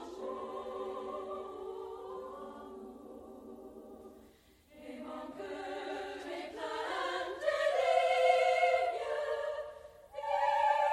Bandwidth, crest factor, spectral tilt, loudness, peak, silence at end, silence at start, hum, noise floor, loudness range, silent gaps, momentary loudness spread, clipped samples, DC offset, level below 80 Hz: 13.5 kHz; 20 dB; -3 dB/octave; -34 LUFS; -14 dBFS; 0 s; 0 s; 60 Hz at -75 dBFS; -63 dBFS; 17 LU; none; 22 LU; under 0.1%; under 0.1%; -70 dBFS